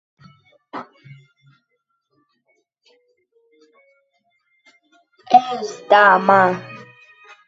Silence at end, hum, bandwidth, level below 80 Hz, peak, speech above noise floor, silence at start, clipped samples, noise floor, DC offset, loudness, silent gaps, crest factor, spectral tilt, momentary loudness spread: 0.7 s; none; 7.8 kHz; -72 dBFS; 0 dBFS; 57 dB; 0.75 s; under 0.1%; -72 dBFS; under 0.1%; -15 LUFS; none; 22 dB; -5 dB/octave; 24 LU